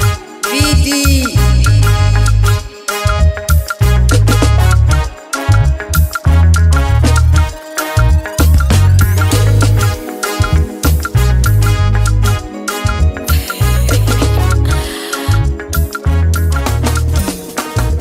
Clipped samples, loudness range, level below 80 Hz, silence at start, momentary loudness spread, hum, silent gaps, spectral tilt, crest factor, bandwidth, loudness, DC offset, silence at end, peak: under 0.1%; 3 LU; -14 dBFS; 0 s; 7 LU; none; none; -5 dB/octave; 10 dB; 16.5 kHz; -12 LUFS; under 0.1%; 0 s; 0 dBFS